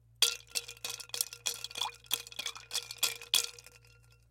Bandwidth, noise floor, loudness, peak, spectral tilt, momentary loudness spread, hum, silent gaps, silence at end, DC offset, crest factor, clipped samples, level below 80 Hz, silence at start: 17 kHz; -61 dBFS; -34 LUFS; -10 dBFS; 2 dB/octave; 10 LU; none; none; 0.55 s; under 0.1%; 28 dB; under 0.1%; -70 dBFS; 0.2 s